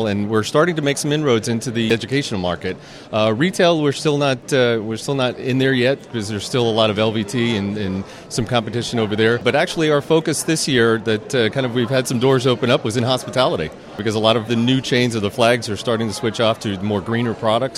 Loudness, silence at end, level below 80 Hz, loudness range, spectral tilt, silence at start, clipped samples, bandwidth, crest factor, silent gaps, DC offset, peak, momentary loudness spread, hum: -18 LUFS; 0 s; -52 dBFS; 2 LU; -5 dB/octave; 0 s; under 0.1%; 15 kHz; 18 dB; none; under 0.1%; 0 dBFS; 7 LU; none